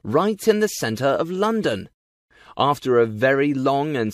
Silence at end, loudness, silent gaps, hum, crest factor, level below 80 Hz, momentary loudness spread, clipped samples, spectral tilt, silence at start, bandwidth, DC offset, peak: 0 s; -21 LUFS; 1.94-2.28 s; none; 18 dB; -60 dBFS; 5 LU; under 0.1%; -5.5 dB/octave; 0.05 s; 15.5 kHz; under 0.1%; -4 dBFS